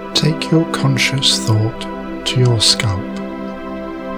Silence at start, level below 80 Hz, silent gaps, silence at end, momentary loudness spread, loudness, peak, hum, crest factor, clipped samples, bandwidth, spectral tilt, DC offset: 0 s; -42 dBFS; none; 0 s; 14 LU; -15 LUFS; 0 dBFS; none; 16 dB; under 0.1%; 19.5 kHz; -4 dB/octave; under 0.1%